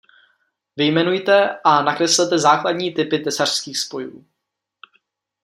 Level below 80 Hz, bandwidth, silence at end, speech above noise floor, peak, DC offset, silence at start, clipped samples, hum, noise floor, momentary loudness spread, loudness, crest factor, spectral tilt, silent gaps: -68 dBFS; 15.5 kHz; 1.25 s; 62 dB; -2 dBFS; under 0.1%; 0.75 s; under 0.1%; none; -80 dBFS; 10 LU; -17 LUFS; 18 dB; -3 dB/octave; none